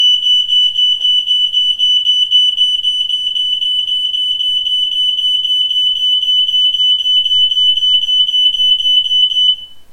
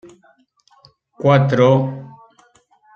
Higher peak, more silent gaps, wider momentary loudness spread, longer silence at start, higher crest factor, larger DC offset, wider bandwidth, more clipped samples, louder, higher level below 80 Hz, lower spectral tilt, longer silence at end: about the same, -2 dBFS vs -2 dBFS; neither; second, 4 LU vs 13 LU; second, 0 s vs 1.2 s; second, 10 dB vs 18 dB; neither; first, 16 kHz vs 6.8 kHz; neither; first, -10 LUFS vs -15 LUFS; first, -52 dBFS vs -58 dBFS; second, 2.5 dB/octave vs -8 dB/octave; second, 0 s vs 0.85 s